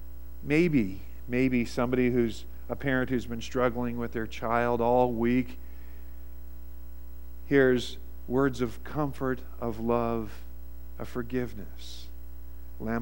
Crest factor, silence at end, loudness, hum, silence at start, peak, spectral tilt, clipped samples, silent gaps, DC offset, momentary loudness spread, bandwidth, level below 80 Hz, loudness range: 20 dB; 0 s; -29 LUFS; none; 0 s; -10 dBFS; -7 dB/octave; under 0.1%; none; 1%; 22 LU; 16.5 kHz; -44 dBFS; 5 LU